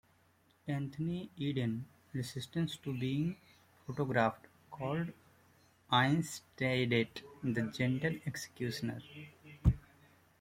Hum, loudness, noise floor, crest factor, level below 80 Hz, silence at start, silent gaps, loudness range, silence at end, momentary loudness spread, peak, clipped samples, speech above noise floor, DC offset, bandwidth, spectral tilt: none; -36 LUFS; -70 dBFS; 22 dB; -50 dBFS; 0.65 s; none; 4 LU; 0.6 s; 14 LU; -14 dBFS; under 0.1%; 34 dB; under 0.1%; 16 kHz; -6 dB/octave